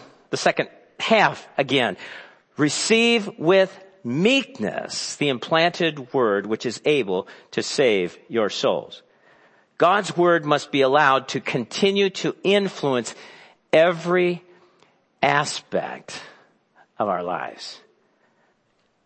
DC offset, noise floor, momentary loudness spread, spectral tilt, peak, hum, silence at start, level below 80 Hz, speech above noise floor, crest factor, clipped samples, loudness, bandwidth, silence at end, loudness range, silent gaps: under 0.1%; -67 dBFS; 14 LU; -4 dB/octave; -2 dBFS; none; 0 s; -72 dBFS; 45 dB; 20 dB; under 0.1%; -21 LUFS; 8.8 kHz; 1.3 s; 6 LU; none